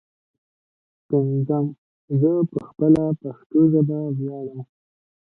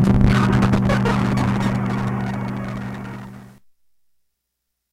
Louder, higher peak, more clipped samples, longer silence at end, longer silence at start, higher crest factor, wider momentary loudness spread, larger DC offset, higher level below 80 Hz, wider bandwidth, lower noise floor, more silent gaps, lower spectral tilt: about the same, -21 LUFS vs -20 LUFS; second, -4 dBFS vs 0 dBFS; neither; second, 0.55 s vs 1.45 s; first, 1.1 s vs 0 s; about the same, 18 dB vs 20 dB; second, 12 LU vs 16 LU; neither; second, -60 dBFS vs -32 dBFS; second, 2.6 kHz vs 12.5 kHz; first, under -90 dBFS vs -77 dBFS; first, 1.78-2.08 s, 3.46-3.50 s vs none; first, -12 dB/octave vs -7.5 dB/octave